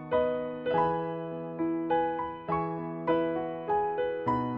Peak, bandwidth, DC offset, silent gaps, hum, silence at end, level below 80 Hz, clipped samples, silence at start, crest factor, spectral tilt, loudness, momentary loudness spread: -16 dBFS; 5.4 kHz; under 0.1%; none; none; 0 s; -58 dBFS; under 0.1%; 0 s; 14 dB; -5.5 dB/octave; -31 LUFS; 6 LU